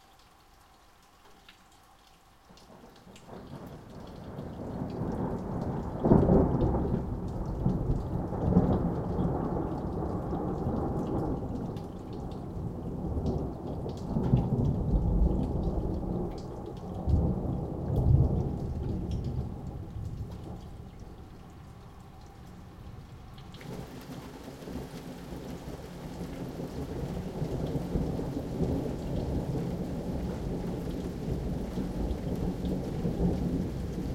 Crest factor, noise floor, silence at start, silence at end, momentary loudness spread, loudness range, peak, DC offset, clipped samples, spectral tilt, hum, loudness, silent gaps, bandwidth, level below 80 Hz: 26 dB; -58 dBFS; 1.25 s; 0 s; 19 LU; 16 LU; -6 dBFS; under 0.1%; under 0.1%; -9 dB/octave; none; -32 LUFS; none; 15.5 kHz; -40 dBFS